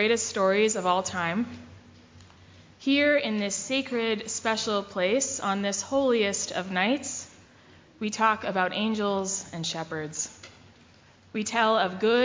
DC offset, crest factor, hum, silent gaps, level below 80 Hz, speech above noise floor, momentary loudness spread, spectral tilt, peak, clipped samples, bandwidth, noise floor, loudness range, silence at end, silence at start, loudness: under 0.1%; 18 dB; none; none; -62 dBFS; 30 dB; 10 LU; -3 dB/octave; -8 dBFS; under 0.1%; 7.8 kHz; -56 dBFS; 3 LU; 0 s; 0 s; -27 LUFS